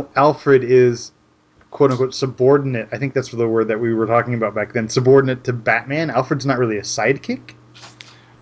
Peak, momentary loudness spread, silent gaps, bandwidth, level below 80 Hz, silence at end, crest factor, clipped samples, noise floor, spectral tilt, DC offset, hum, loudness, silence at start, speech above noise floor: -2 dBFS; 9 LU; none; 8 kHz; -56 dBFS; 0.55 s; 16 dB; under 0.1%; -54 dBFS; -6 dB/octave; under 0.1%; none; -17 LUFS; 0 s; 37 dB